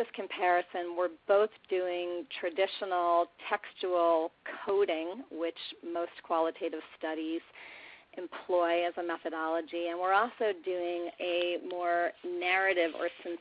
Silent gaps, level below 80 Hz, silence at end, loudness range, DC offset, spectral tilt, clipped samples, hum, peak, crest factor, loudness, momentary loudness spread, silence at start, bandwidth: none; -78 dBFS; 0 s; 4 LU; under 0.1%; -6.5 dB/octave; under 0.1%; none; -14 dBFS; 20 dB; -32 LUFS; 10 LU; 0 s; 5.2 kHz